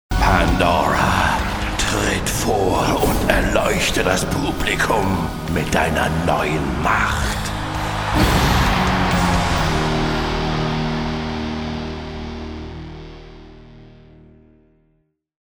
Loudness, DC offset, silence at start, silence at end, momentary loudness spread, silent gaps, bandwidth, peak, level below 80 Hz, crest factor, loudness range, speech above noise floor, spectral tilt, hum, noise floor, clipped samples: -19 LUFS; under 0.1%; 0.1 s; 1.6 s; 11 LU; none; over 20 kHz; 0 dBFS; -28 dBFS; 20 dB; 12 LU; 46 dB; -4.5 dB/octave; none; -65 dBFS; under 0.1%